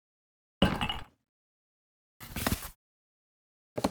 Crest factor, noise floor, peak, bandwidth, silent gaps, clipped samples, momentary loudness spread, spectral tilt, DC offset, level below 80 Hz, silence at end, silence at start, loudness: 26 dB; under -90 dBFS; -12 dBFS; over 20 kHz; 1.29-2.20 s, 2.75-3.76 s; under 0.1%; 15 LU; -4.5 dB/octave; under 0.1%; -48 dBFS; 0 s; 0.6 s; -33 LUFS